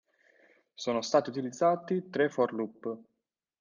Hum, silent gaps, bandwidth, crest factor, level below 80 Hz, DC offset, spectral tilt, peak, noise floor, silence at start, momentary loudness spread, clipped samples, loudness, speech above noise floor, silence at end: none; none; 9.8 kHz; 20 dB; -80 dBFS; under 0.1%; -5 dB/octave; -12 dBFS; -65 dBFS; 0.8 s; 12 LU; under 0.1%; -31 LUFS; 35 dB; 0.6 s